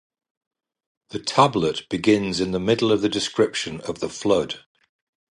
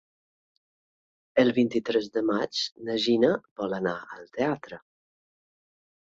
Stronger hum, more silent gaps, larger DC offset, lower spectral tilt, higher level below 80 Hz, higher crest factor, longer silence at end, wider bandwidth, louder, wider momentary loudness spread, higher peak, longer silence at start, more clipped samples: neither; second, none vs 2.72-2.76 s, 3.51-3.56 s; neither; about the same, -4.5 dB/octave vs -5 dB/octave; first, -54 dBFS vs -68 dBFS; about the same, 22 dB vs 20 dB; second, 0.75 s vs 1.3 s; first, 11.5 kHz vs 7.8 kHz; first, -22 LUFS vs -27 LUFS; second, 11 LU vs 14 LU; first, -2 dBFS vs -8 dBFS; second, 1.15 s vs 1.35 s; neither